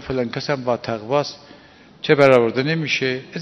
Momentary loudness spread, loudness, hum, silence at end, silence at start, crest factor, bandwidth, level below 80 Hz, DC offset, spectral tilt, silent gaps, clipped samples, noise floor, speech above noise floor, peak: 11 LU; -19 LUFS; none; 0 s; 0 s; 20 dB; 9.6 kHz; -54 dBFS; under 0.1%; -5.5 dB/octave; none; under 0.1%; -46 dBFS; 27 dB; 0 dBFS